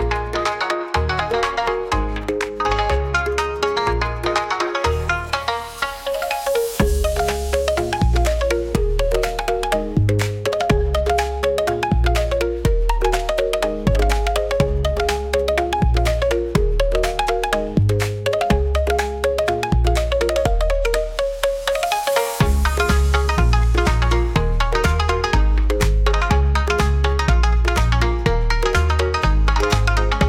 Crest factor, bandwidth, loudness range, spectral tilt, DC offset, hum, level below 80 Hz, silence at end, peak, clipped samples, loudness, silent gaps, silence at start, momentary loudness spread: 14 dB; 16.5 kHz; 3 LU; -5.5 dB/octave; under 0.1%; none; -22 dBFS; 0 s; -4 dBFS; under 0.1%; -19 LUFS; none; 0 s; 4 LU